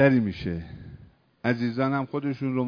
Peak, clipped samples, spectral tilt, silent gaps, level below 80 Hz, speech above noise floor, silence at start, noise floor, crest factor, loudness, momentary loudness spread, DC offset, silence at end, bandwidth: -6 dBFS; under 0.1%; -9 dB/octave; none; -52 dBFS; 26 dB; 0 s; -51 dBFS; 20 dB; -27 LUFS; 17 LU; under 0.1%; 0 s; 5.4 kHz